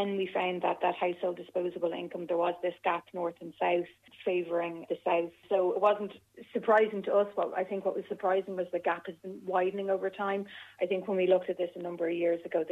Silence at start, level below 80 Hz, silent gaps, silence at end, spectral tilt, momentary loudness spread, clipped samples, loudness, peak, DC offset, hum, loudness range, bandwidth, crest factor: 0 s; -80 dBFS; none; 0 s; -7 dB/octave; 9 LU; under 0.1%; -31 LUFS; -14 dBFS; under 0.1%; none; 3 LU; 8 kHz; 18 dB